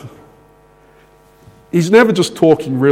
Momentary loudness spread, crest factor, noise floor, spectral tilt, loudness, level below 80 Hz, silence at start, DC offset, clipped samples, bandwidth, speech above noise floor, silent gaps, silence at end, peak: 7 LU; 16 dB; -47 dBFS; -6 dB/octave; -12 LUFS; -54 dBFS; 0.05 s; under 0.1%; under 0.1%; 15.5 kHz; 36 dB; none; 0 s; 0 dBFS